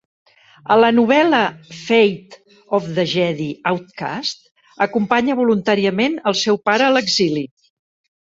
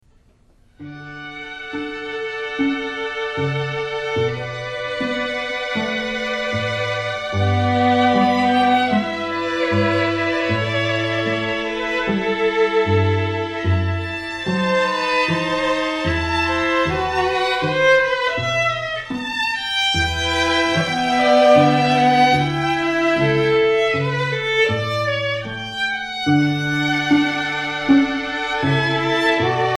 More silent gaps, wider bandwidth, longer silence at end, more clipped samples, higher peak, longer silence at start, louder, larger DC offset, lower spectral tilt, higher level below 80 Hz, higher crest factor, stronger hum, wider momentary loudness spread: first, 4.51-4.55 s vs none; second, 7.8 kHz vs 12.5 kHz; first, 0.8 s vs 0 s; neither; about the same, -2 dBFS vs -2 dBFS; about the same, 0.7 s vs 0.8 s; about the same, -17 LUFS vs -19 LUFS; neither; about the same, -4.5 dB/octave vs -5.5 dB/octave; second, -62 dBFS vs -44 dBFS; about the same, 16 dB vs 16 dB; neither; first, 12 LU vs 9 LU